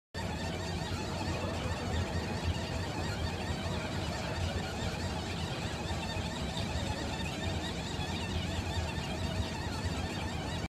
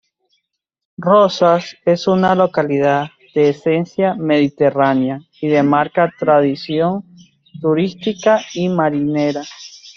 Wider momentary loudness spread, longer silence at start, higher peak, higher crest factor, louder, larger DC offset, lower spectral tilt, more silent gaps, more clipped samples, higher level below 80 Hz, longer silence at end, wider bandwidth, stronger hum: second, 1 LU vs 8 LU; second, 0.15 s vs 1 s; second, -22 dBFS vs 0 dBFS; about the same, 14 dB vs 16 dB; second, -36 LUFS vs -16 LUFS; neither; second, -5 dB/octave vs -6.5 dB/octave; neither; neither; first, -44 dBFS vs -60 dBFS; about the same, 0 s vs 0.05 s; first, 15 kHz vs 7.2 kHz; neither